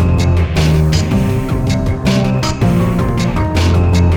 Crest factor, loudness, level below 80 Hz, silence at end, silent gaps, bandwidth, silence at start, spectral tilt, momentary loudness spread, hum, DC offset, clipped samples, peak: 10 dB; -14 LUFS; -22 dBFS; 0 s; none; 16.5 kHz; 0 s; -6.5 dB/octave; 4 LU; none; under 0.1%; under 0.1%; -2 dBFS